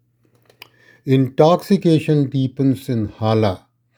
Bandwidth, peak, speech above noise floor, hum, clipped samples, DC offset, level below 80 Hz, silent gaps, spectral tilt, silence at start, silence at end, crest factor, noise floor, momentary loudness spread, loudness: over 20 kHz; 0 dBFS; 41 dB; none; under 0.1%; under 0.1%; -58 dBFS; none; -8 dB/octave; 1.05 s; 0.4 s; 18 dB; -58 dBFS; 8 LU; -17 LUFS